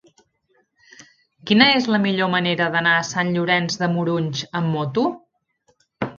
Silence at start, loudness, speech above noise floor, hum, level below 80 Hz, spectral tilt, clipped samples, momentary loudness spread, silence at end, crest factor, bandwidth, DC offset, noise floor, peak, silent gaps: 1 s; -19 LUFS; 46 dB; none; -62 dBFS; -5 dB/octave; under 0.1%; 10 LU; 0.05 s; 22 dB; 7.4 kHz; under 0.1%; -65 dBFS; 0 dBFS; none